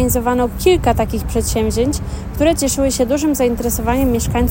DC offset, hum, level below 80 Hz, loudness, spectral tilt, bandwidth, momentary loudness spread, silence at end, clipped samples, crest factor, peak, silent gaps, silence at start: under 0.1%; none; -26 dBFS; -16 LUFS; -5 dB/octave; 16.5 kHz; 5 LU; 0 s; under 0.1%; 14 dB; -2 dBFS; none; 0 s